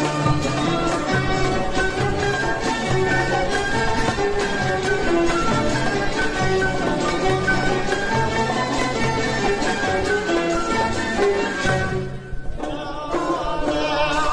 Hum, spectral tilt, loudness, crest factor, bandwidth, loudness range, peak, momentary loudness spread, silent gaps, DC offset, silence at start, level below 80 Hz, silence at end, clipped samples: none; -5 dB/octave; -21 LUFS; 14 dB; 11 kHz; 2 LU; -6 dBFS; 4 LU; none; under 0.1%; 0 s; -34 dBFS; 0 s; under 0.1%